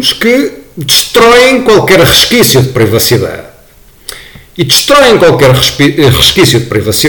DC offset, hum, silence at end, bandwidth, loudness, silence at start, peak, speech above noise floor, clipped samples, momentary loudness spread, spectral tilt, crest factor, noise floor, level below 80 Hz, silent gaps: under 0.1%; none; 0 s; over 20 kHz; -5 LUFS; 0 s; 0 dBFS; 32 dB; 1%; 15 LU; -3.5 dB/octave; 6 dB; -38 dBFS; -30 dBFS; none